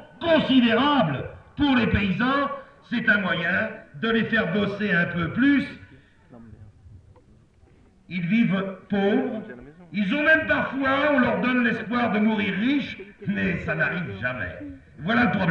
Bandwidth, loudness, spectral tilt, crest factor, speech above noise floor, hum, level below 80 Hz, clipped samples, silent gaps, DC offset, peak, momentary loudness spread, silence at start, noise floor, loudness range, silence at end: 6.8 kHz; -23 LUFS; -7.5 dB/octave; 16 dB; 32 dB; none; -48 dBFS; under 0.1%; none; under 0.1%; -8 dBFS; 14 LU; 0 s; -55 dBFS; 6 LU; 0 s